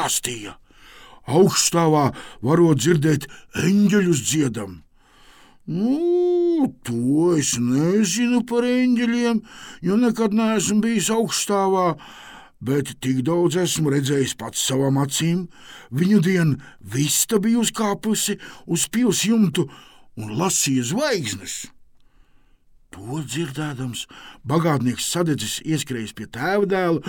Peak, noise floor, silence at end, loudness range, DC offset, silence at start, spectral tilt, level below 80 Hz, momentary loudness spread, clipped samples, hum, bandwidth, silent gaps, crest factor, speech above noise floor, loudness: -4 dBFS; -54 dBFS; 0 s; 5 LU; under 0.1%; 0 s; -4.5 dB/octave; -56 dBFS; 13 LU; under 0.1%; none; 18 kHz; none; 18 dB; 33 dB; -20 LUFS